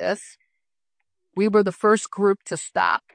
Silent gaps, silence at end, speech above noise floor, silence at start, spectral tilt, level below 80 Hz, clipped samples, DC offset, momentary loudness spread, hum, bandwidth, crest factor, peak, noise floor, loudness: none; 0.15 s; 61 dB; 0 s; -4.5 dB/octave; -70 dBFS; under 0.1%; under 0.1%; 8 LU; none; 10 kHz; 18 dB; -6 dBFS; -83 dBFS; -22 LUFS